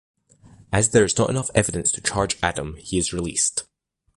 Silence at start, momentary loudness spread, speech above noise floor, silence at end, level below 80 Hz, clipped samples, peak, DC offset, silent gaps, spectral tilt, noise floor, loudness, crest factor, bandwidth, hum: 0.7 s; 8 LU; 29 dB; 0.55 s; -42 dBFS; under 0.1%; -4 dBFS; under 0.1%; none; -3.5 dB/octave; -51 dBFS; -22 LUFS; 20 dB; 11.5 kHz; none